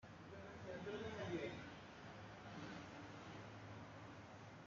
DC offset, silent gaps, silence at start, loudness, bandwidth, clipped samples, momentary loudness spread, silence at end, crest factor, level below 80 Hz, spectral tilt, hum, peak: under 0.1%; none; 0 s; -53 LUFS; 7.4 kHz; under 0.1%; 10 LU; 0 s; 18 dB; -76 dBFS; -4.5 dB/octave; none; -34 dBFS